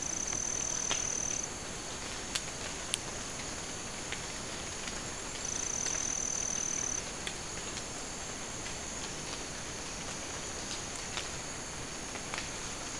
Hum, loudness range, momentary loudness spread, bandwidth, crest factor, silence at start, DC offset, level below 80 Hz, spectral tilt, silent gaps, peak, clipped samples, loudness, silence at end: none; 4 LU; 7 LU; 12 kHz; 28 dB; 0 s; 0.2%; -52 dBFS; -1.5 dB/octave; none; -10 dBFS; under 0.1%; -36 LUFS; 0 s